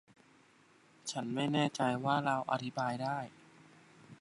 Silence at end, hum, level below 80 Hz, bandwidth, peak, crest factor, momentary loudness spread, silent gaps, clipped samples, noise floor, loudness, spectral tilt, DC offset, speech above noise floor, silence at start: 0.05 s; none; -80 dBFS; 11.5 kHz; -16 dBFS; 20 dB; 10 LU; none; under 0.1%; -65 dBFS; -35 LUFS; -5 dB/octave; under 0.1%; 31 dB; 1.05 s